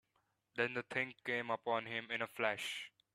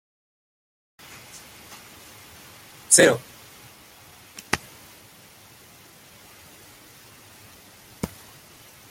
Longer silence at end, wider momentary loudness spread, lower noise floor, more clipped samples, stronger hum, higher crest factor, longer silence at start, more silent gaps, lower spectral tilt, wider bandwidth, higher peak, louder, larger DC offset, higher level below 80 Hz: second, 0.25 s vs 0.85 s; second, 5 LU vs 29 LU; first, -82 dBFS vs -50 dBFS; neither; neither; second, 22 dB vs 30 dB; second, 0.55 s vs 2.9 s; neither; first, -3.5 dB/octave vs -2 dB/octave; second, 14 kHz vs 16.5 kHz; second, -18 dBFS vs 0 dBFS; second, -40 LUFS vs -20 LUFS; neither; second, -84 dBFS vs -60 dBFS